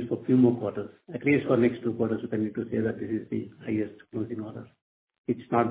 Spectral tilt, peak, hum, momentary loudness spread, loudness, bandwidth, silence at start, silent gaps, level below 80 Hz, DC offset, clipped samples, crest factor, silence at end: -7.5 dB/octave; -10 dBFS; none; 15 LU; -28 LUFS; 4 kHz; 0 s; 4.82-5.07 s, 5.18-5.24 s; -62 dBFS; under 0.1%; under 0.1%; 18 dB; 0 s